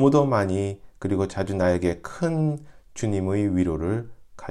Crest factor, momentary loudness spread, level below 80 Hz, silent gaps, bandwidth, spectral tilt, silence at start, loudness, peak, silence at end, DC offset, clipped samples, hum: 18 dB; 11 LU; -46 dBFS; none; 11.5 kHz; -7.5 dB/octave; 0 s; -25 LUFS; -6 dBFS; 0 s; under 0.1%; under 0.1%; none